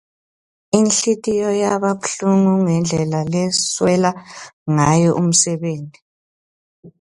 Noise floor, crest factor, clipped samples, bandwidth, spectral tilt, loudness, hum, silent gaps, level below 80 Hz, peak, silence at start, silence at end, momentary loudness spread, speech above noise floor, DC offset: under -90 dBFS; 18 dB; under 0.1%; 11.5 kHz; -4.5 dB/octave; -17 LUFS; none; 4.53-4.66 s, 6.02-6.83 s; -52 dBFS; 0 dBFS; 0.75 s; 0.1 s; 11 LU; over 73 dB; under 0.1%